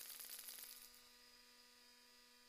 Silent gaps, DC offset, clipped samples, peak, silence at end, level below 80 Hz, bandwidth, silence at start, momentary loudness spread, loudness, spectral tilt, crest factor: none; under 0.1%; under 0.1%; -36 dBFS; 0 s; -86 dBFS; 15.5 kHz; 0 s; 14 LU; -56 LUFS; 1.5 dB/octave; 24 dB